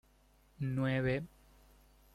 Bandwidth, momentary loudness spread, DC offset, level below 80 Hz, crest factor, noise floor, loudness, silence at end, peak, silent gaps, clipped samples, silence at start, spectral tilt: 13 kHz; 10 LU; under 0.1%; -60 dBFS; 18 dB; -67 dBFS; -36 LUFS; 0.85 s; -20 dBFS; none; under 0.1%; 0.6 s; -8 dB/octave